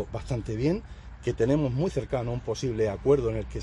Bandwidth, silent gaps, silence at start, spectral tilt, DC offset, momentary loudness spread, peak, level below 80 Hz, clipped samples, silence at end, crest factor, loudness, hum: 11.5 kHz; none; 0 s; -7.5 dB/octave; under 0.1%; 9 LU; -10 dBFS; -42 dBFS; under 0.1%; 0 s; 16 dB; -28 LUFS; none